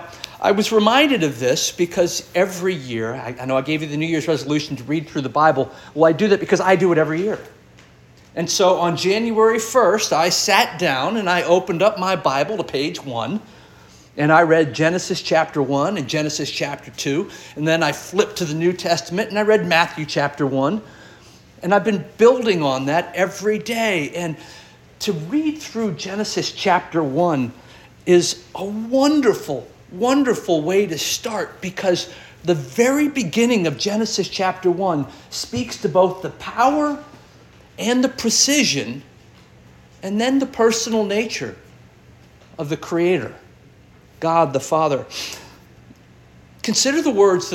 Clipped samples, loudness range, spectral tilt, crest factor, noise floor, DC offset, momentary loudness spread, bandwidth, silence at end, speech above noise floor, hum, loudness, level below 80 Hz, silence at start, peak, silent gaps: under 0.1%; 5 LU; -4 dB/octave; 18 dB; -48 dBFS; under 0.1%; 12 LU; 17 kHz; 0 s; 29 dB; none; -19 LUFS; -56 dBFS; 0 s; -2 dBFS; none